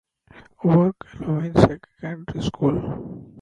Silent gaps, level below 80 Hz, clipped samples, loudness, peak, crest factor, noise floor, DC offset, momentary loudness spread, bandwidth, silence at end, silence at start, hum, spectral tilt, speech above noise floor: none; -44 dBFS; under 0.1%; -22 LUFS; 0 dBFS; 22 dB; -50 dBFS; under 0.1%; 16 LU; 9.4 kHz; 0 s; 0.35 s; none; -8.5 dB/octave; 29 dB